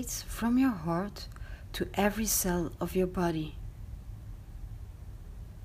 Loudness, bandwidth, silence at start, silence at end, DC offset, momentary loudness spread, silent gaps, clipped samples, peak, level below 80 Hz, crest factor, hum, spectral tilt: -31 LUFS; 15.5 kHz; 0 s; 0 s; under 0.1%; 20 LU; none; under 0.1%; -14 dBFS; -44 dBFS; 20 dB; none; -4.5 dB/octave